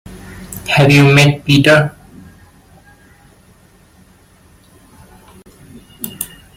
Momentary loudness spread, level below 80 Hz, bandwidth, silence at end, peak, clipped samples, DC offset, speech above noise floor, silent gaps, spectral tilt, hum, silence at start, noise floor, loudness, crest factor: 22 LU; -44 dBFS; 16.5 kHz; 0.3 s; 0 dBFS; under 0.1%; under 0.1%; 38 dB; none; -5.5 dB/octave; none; 0.1 s; -47 dBFS; -10 LUFS; 16 dB